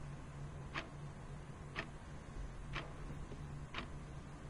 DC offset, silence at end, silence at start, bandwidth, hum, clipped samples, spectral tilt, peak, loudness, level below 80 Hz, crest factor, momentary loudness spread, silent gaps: under 0.1%; 0 s; 0 s; 11.5 kHz; none; under 0.1%; -5.5 dB/octave; -28 dBFS; -49 LUFS; -52 dBFS; 20 dB; 5 LU; none